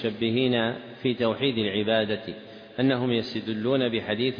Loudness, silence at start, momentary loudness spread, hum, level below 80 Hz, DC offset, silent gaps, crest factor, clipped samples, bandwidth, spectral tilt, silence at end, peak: -26 LUFS; 0 s; 8 LU; none; -64 dBFS; under 0.1%; none; 14 dB; under 0.1%; 5.2 kHz; -8 dB/octave; 0 s; -12 dBFS